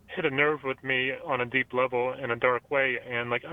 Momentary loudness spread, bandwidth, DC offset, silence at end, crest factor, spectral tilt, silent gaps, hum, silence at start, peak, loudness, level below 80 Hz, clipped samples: 5 LU; 4 kHz; under 0.1%; 0 s; 20 dB; -7 dB/octave; none; none; 0.1 s; -8 dBFS; -27 LUFS; -64 dBFS; under 0.1%